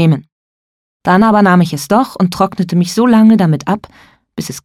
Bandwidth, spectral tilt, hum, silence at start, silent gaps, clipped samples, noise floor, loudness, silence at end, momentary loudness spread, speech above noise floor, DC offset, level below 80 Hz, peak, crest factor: 14 kHz; -6.5 dB/octave; none; 0 s; 0.32-1.00 s; under 0.1%; under -90 dBFS; -11 LUFS; 0.05 s; 13 LU; over 79 dB; under 0.1%; -48 dBFS; 0 dBFS; 12 dB